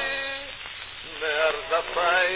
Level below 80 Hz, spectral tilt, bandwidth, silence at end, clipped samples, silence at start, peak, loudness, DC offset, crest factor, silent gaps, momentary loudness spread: -54 dBFS; -5.5 dB/octave; 4 kHz; 0 s; under 0.1%; 0 s; -10 dBFS; -26 LUFS; under 0.1%; 18 dB; none; 13 LU